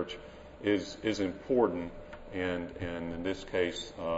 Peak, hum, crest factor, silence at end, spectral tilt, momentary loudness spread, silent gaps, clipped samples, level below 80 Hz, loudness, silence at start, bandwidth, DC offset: -14 dBFS; none; 20 dB; 0 s; -5.5 dB/octave; 13 LU; none; under 0.1%; -54 dBFS; -34 LUFS; 0 s; 8 kHz; under 0.1%